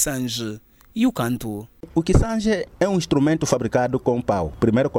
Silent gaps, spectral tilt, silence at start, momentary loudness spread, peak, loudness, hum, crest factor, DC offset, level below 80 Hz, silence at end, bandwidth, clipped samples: none; -5.5 dB/octave; 0 s; 10 LU; -6 dBFS; -22 LUFS; none; 16 dB; under 0.1%; -34 dBFS; 0 s; 17 kHz; under 0.1%